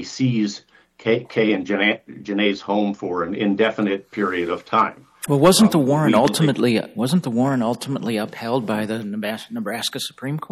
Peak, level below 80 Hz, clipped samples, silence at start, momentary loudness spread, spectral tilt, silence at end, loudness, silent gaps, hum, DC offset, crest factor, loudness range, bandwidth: -4 dBFS; -60 dBFS; under 0.1%; 0 s; 11 LU; -5 dB/octave; 0.05 s; -20 LUFS; none; none; under 0.1%; 16 dB; 5 LU; 15 kHz